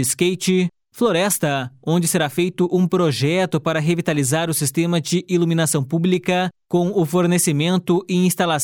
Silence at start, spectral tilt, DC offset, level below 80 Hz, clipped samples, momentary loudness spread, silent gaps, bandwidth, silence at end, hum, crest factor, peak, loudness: 0 s; -5 dB/octave; under 0.1%; -60 dBFS; under 0.1%; 3 LU; none; 18.5 kHz; 0 s; none; 14 dB; -6 dBFS; -19 LUFS